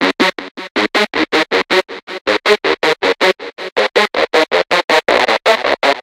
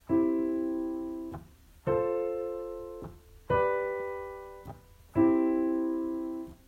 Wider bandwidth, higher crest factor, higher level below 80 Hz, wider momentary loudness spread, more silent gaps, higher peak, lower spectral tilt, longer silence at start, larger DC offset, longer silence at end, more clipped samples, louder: first, 16.5 kHz vs 4.4 kHz; about the same, 14 dB vs 16 dB; about the same, -54 dBFS vs -56 dBFS; second, 7 LU vs 18 LU; first, 0.51-0.55 s, 0.71-0.75 s, 2.03-2.07 s, 2.21-2.25 s, 3.72-3.76 s, 4.84-4.88 s vs none; first, 0 dBFS vs -14 dBFS; second, -2.5 dB/octave vs -8.5 dB/octave; about the same, 0 s vs 0.1 s; neither; second, 0 s vs 0.15 s; neither; first, -14 LUFS vs -31 LUFS